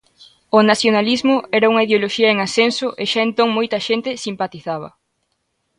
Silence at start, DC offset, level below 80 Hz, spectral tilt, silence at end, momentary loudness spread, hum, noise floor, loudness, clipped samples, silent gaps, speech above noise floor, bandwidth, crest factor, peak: 0.55 s; under 0.1%; -62 dBFS; -4 dB/octave; 0.9 s; 11 LU; none; -70 dBFS; -17 LUFS; under 0.1%; none; 53 dB; 11 kHz; 16 dB; 0 dBFS